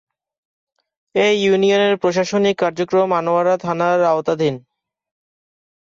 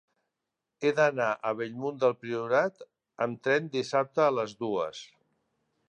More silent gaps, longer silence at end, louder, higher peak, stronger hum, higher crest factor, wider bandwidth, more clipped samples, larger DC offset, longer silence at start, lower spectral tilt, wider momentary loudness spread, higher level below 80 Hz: neither; first, 1.25 s vs 0.85 s; first, -17 LUFS vs -29 LUFS; first, -4 dBFS vs -10 dBFS; neither; second, 14 dB vs 20 dB; second, 7.6 kHz vs 9.2 kHz; neither; neither; first, 1.15 s vs 0.8 s; about the same, -5 dB/octave vs -5.5 dB/octave; about the same, 6 LU vs 8 LU; first, -62 dBFS vs -80 dBFS